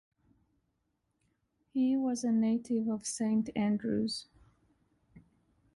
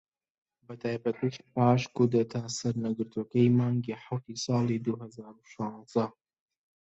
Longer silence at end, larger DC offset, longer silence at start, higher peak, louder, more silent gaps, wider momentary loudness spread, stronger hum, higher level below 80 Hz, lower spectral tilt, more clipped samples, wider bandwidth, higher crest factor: second, 0.55 s vs 0.7 s; neither; first, 1.75 s vs 0.7 s; second, -22 dBFS vs -10 dBFS; about the same, -32 LUFS vs -30 LUFS; neither; second, 5 LU vs 13 LU; neither; about the same, -70 dBFS vs -68 dBFS; second, -5 dB/octave vs -7 dB/octave; neither; first, 11.5 kHz vs 8 kHz; second, 12 dB vs 20 dB